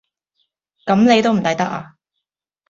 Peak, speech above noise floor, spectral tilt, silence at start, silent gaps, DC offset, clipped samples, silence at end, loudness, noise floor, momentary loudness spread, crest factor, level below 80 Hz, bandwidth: -2 dBFS; 64 dB; -5.5 dB/octave; 0.85 s; none; under 0.1%; under 0.1%; 0.85 s; -16 LUFS; -79 dBFS; 16 LU; 18 dB; -58 dBFS; 7.6 kHz